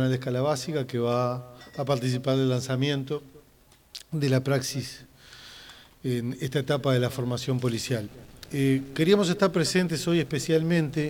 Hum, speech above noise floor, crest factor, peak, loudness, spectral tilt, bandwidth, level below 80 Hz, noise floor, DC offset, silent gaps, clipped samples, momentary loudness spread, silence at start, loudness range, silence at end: none; 32 dB; 20 dB; -8 dBFS; -27 LUFS; -5.5 dB/octave; 19 kHz; -58 dBFS; -58 dBFS; under 0.1%; none; under 0.1%; 17 LU; 0 s; 5 LU; 0 s